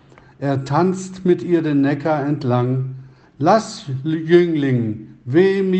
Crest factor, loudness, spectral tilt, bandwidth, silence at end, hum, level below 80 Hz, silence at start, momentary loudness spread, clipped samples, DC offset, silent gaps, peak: 18 dB; -18 LUFS; -7.5 dB/octave; 8.6 kHz; 0 s; none; -60 dBFS; 0.4 s; 11 LU; under 0.1%; under 0.1%; none; 0 dBFS